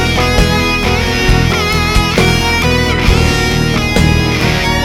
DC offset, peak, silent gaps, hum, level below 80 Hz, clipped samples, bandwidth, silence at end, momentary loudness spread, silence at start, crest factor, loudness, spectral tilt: under 0.1%; 0 dBFS; none; none; -18 dBFS; under 0.1%; 17.5 kHz; 0 s; 2 LU; 0 s; 12 dB; -11 LUFS; -4.5 dB/octave